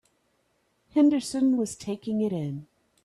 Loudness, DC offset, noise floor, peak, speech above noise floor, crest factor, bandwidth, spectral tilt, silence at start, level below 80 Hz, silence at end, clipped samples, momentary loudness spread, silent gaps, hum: -26 LUFS; under 0.1%; -71 dBFS; -12 dBFS; 46 dB; 16 dB; 12.5 kHz; -6 dB/octave; 0.95 s; -66 dBFS; 0.4 s; under 0.1%; 12 LU; none; none